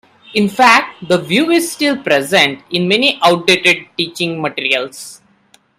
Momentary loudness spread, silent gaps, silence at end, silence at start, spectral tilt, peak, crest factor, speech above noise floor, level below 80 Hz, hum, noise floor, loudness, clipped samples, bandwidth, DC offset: 9 LU; none; 0.65 s; 0.3 s; -3.5 dB/octave; 0 dBFS; 14 dB; 38 dB; -58 dBFS; none; -52 dBFS; -13 LUFS; under 0.1%; 16 kHz; under 0.1%